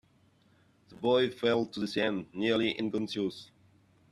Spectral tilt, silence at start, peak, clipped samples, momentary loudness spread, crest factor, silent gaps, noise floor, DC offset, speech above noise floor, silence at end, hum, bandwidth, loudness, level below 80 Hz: -5.5 dB/octave; 0.9 s; -14 dBFS; under 0.1%; 7 LU; 18 dB; none; -66 dBFS; under 0.1%; 36 dB; 0.65 s; none; 12.5 kHz; -31 LUFS; -72 dBFS